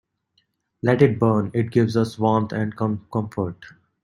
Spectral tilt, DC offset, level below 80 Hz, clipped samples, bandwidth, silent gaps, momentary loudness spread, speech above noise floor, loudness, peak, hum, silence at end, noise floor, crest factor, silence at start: -8.5 dB/octave; under 0.1%; -56 dBFS; under 0.1%; 11.5 kHz; none; 10 LU; 48 dB; -22 LUFS; -2 dBFS; none; 0.35 s; -69 dBFS; 20 dB; 0.85 s